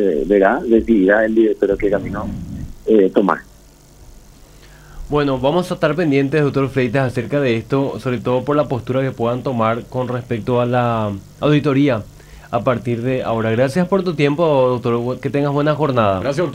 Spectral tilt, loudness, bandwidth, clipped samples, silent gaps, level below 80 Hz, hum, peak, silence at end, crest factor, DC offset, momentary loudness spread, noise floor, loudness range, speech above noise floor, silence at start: -7.5 dB/octave; -17 LUFS; 16 kHz; under 0.1%; none; -40 dBFS; none; 0 dBFS; 0 s; 16 dB; under 0.1%; 8 LU; -45 dBFS; 4 LU; 28 dB; 0 s